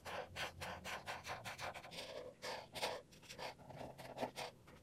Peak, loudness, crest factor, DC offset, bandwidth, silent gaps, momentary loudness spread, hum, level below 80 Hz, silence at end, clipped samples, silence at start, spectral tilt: -28 dBFS; -48 LUFS; 22 dB; under 0.1%; 16 kHz; none; 8 LU; none; -72 dBFS; 0 s; under 0.1%; 0 s; -3 dB/octave